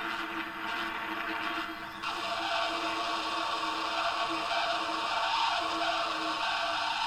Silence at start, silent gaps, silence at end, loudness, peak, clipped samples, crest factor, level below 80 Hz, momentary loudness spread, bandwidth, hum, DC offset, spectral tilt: 0 s; none; 0 s; -31 LUFS; -16 dBFS; under 0.1%; 16 dB; -62 dBFS; 5 LU; 16.5 kHz; none; under 0.1%; -1.5 dB/octave